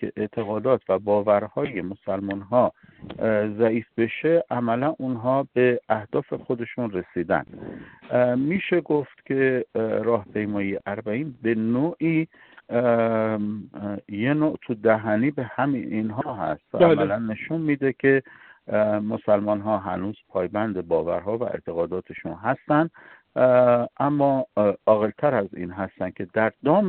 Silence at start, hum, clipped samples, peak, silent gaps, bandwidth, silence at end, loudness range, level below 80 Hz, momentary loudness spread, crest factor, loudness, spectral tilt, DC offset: 0 s; none; under 0.1%; -4 dBFS; none; 4.3 kHz; 0 s; 4 LU; -62 dBFS; 9 LU; 18 dB; -24 LUFS; -11.5 dB/octave; under 0.1%